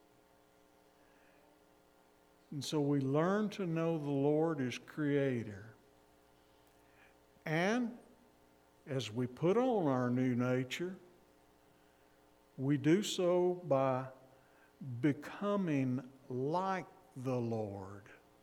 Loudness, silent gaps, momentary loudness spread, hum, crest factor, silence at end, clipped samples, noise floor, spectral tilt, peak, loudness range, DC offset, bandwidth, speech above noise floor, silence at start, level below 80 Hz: -36 LUFS; none; 16 LU; none; 18 dB; 0.25 s; under 0.1%; -67 dBFS; -6.5 dB/octave; -18 dBFS; 6 LU; under 0.1%; 16.5 kHz; 33 dB; 2.5 s; -78 dBFS